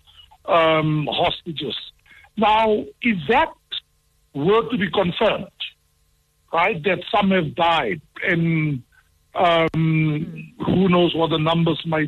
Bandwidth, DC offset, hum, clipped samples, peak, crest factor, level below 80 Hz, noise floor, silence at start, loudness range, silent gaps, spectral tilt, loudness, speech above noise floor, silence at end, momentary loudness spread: 6.2 kHz; under 0.1%; none; under 0.1%; -6 dBFS; 14 dB; -50 dBFS; -63 dBFS; 0.45 s; 2 LU; none; -7.5 dB/octave; -20 LUFS; 44 dB; 0 s; 14 LU